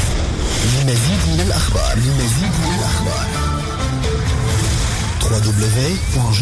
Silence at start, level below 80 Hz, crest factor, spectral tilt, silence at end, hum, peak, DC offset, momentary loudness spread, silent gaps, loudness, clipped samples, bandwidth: 0 s; -22 dBFS; 10 dB; -4.5 dB/octave; 0 s; none; -6 dBFS; under 0.1%; 4 LU; none; -17 LUFS; under 0.1%; 11 kHz